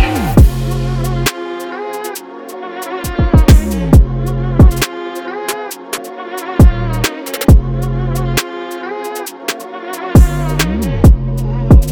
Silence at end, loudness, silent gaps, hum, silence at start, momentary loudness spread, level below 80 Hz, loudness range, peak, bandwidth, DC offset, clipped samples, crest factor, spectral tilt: 0 s; -14 LUFS; none; none; 0 s; 13 LU; -16 dBFS; 3 LU; 0 dBFS; 20 kHz; under 0.1%; under 0.1%; 12 dB; -6 dB/octave